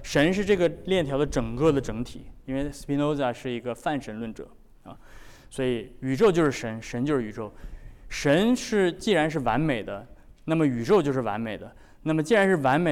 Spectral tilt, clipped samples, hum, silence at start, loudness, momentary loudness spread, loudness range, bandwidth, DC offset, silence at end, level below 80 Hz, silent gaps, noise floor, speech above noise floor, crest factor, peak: -6 dB/octave; under 0.1%; none; 0 s; -25 LUFS; 15 LU; 6 LU; 16 kHz; under 0.1%; 0 s; -46 dBFS; none; -47 dBFS; 22 dB; 14 dB; -12 dBFS